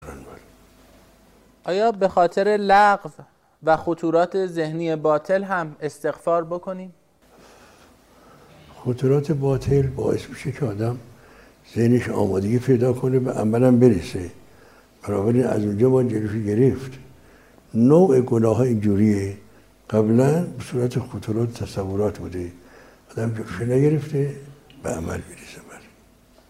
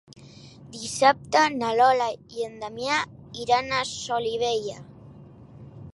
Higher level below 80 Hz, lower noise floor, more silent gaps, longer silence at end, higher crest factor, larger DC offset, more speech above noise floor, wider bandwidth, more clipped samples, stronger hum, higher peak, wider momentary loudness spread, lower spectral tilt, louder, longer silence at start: first, -50 dBFS vs -60 dBFS; first, -54 dBFS vs -47 dBFS; neither; first, 0.7 s vs 0.05 s; about the same, 20 dB vs 20 dB; neither; first, 34 dB vs 23 dB; first, 15 kHz vs 11.5 kHz; neither; neither; about the same, -2 dBFS vs -4 dBFS; about the same, 16 LU vs 16 LU; first, -8 dB/octave vs -3 dB/octave; first, -21 LUFS vs -24 LUFS; second, 0 s vs 0.15 s